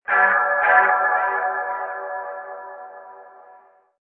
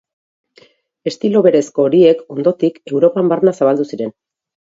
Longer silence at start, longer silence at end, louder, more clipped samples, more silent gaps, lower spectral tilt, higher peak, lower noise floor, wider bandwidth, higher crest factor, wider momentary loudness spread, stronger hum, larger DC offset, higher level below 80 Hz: second, 0.1 s vs 1.05 s; about the same, 0.75 s vs 0.65 s; second, -19 LUFS vs -14 LUFS; neither; neither; about the same, -7 dB/octave vs -7 dB/octave; about the same, -2 dBFS vs 0 dBFS; about the same, -51 dBFS vs -50 dBFS; second, 3.9 kHz vs 7.8 kHz; about the same, 20 dB vs 16 dB; first, 21 LU vs 13 LU; neither; neither; second, -74 dBFS vs -62 dBFS